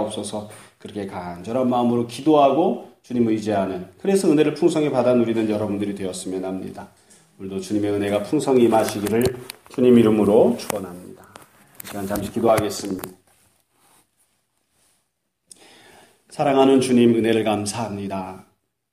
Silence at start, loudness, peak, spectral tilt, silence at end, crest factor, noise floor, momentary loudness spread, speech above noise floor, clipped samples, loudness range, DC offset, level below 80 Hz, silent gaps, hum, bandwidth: 0 s; -20 LUFS; -2 dBFS; -6 dB/octave; 0.5 s; 20 dB; -73 dBFS; 17 LU; 53 dB; under 0.1%; 8 LU; under 0.1%; -56 dBFS; none; none; 15.5 kHz